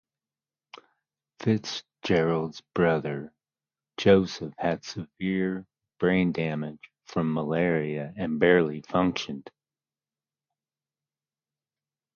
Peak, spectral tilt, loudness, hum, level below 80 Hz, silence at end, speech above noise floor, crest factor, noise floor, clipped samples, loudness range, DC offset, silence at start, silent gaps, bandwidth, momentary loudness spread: -6 dBFS; -6.5 dB/octave; -27 LUFS; none; -58 dBFS; 2.75 s; over 64 dB; 22 dB; under -90 dBFS; under 0.1%; 3 LU; under 0.1%; 1.4 s; none; 7 kHz; 14 LU